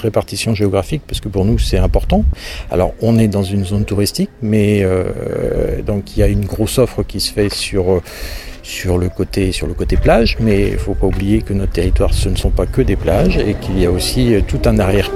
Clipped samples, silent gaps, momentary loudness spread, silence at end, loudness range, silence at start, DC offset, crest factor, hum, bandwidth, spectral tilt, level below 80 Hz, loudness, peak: under 0.1%; none; 7 LU; 0 s; 2 LU; 0 s; under 0.1%; 14 dB; none; 15.5 kHz; -6 dB/octave; -20 dBFS; -16 LUFS; 0 dBFS